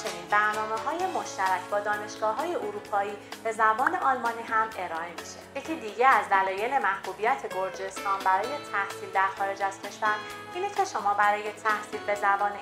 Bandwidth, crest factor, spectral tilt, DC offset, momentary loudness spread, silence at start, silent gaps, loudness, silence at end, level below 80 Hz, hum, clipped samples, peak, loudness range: 16 kHz; 20 dB; -3 dB/octave; under 0.1%; 10 LU; 0 s; none; -28 LUFS; 0 s; -68 dBFS; none; under 0.1%; -8 dBFS; 3 LU